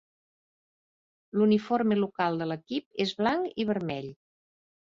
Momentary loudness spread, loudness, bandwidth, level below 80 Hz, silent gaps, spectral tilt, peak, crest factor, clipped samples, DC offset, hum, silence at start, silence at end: 10 LU; -28 LUFS; 7.4 kHz; -68 dBFS; 2.86-2.91 s; -7 dB/octave; -12 dBFS; 18 dB; under 0.1%; under 0.1%; none; 1.35 s; 0.75 s